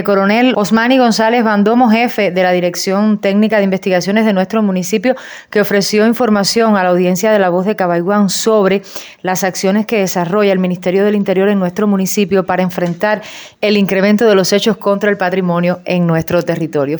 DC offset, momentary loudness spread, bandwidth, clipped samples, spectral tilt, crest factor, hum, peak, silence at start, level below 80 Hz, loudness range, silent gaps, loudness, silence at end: under 0.1%; 5 LU; over 20 kHz; under 0.1%; -5 dB/octave; 10 dB; none; -2 dBFS; 0 s; -56 dBFS; 2 LU; none; -13 LUFS; 0 s